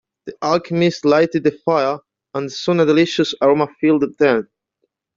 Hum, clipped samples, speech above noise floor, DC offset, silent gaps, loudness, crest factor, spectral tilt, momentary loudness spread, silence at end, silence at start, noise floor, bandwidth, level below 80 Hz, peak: none; under 0.1%; 55 dB; under 0.1%; none; -17 LUFS; 14 dB; -6 dB/octave; 11 LU; 0.75 s; 0.25 s; -71 dBFS; 7.6 kHz; -60 dBFS; -2 dBFS